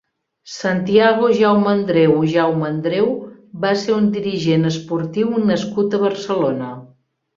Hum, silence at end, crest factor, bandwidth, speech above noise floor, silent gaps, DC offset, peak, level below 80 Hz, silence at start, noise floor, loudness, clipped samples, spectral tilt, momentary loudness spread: none; 0.5 s; 16 dB; 7.6 kHz; 38 dB; none; under 0.1%; -2 dBFS; -58 dBFS; 0.45 s; -54 dBFS; -17 LUFS; under 0.1%; -6.5 dB/octave; 10 LU